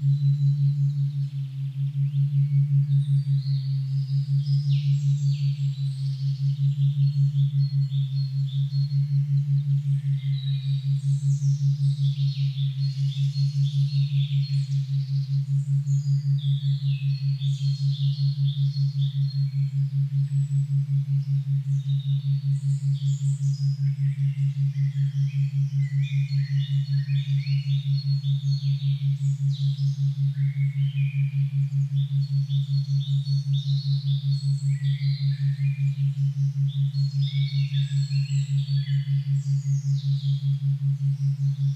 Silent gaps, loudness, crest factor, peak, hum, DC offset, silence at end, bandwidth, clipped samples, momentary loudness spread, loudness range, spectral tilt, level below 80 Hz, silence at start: none; -25 LUFS; 10 dB; -14 dBFS; none; under 0.1%; 0 s; 7.8 kHz; under 0.1%; 3 LU; 1 LU; -7.5 dB/octave; -68 dBFS; 0 s